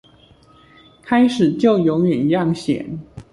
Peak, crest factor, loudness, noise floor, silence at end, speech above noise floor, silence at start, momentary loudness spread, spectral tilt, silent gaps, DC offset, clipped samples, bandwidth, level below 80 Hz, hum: -4 dBFS; 16 dB; -17 LUFS; -50 dBFS; 0.1 s; 33 dB; 1.05 s; 9 LU; -7.5 dB/octave; none; under 0.1%; under 0.1%; 11.5 kHz; -52 dBFS; none